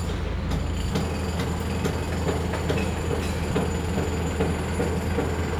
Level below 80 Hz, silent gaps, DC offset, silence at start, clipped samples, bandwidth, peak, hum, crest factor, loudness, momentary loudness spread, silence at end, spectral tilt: -34 dBFS; none; under 0.1%; 0 s; under 0.1%; 15.5 kHz; -12 dBFS; none; 14 dB; -27 LUFS; 2 LU; 0 s; -6 dB/octave